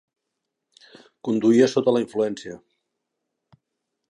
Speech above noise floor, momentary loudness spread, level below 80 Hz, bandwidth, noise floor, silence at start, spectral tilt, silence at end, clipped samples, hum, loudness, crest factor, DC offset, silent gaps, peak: 61 dB; 20 LU; -72 dBFS; 10.5 kHz; -81 dBFS; 1.25 s; -6 dB/octave; 1.55 s; under 0.1%; none; -21 LUFS; 20 dB; under 0.1%; none; -4 dBFS